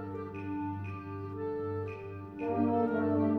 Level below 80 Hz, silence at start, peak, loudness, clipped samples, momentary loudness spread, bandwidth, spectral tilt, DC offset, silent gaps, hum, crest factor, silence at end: -66 dBFS; 0 s; -16 dBFS; -35 LUFS; under 0.1%; 11 LU; 4.7 kHz; -10.5 dB/octave; under 0.1%; none; none; 16 dB; 0 s